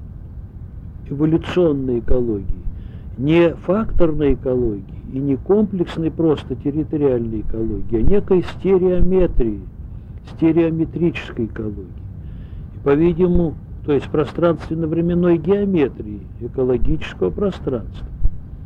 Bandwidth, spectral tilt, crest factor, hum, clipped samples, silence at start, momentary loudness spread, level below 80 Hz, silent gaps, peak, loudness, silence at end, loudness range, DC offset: 5.4 kHz; -9.5 dB/octave; 16 dB; none; under 0.1%; 0 s; 18 LU; -28 dBFS; none; -2 dBFS; -19 LUFS; 0 s; 3 LU; under 0.1%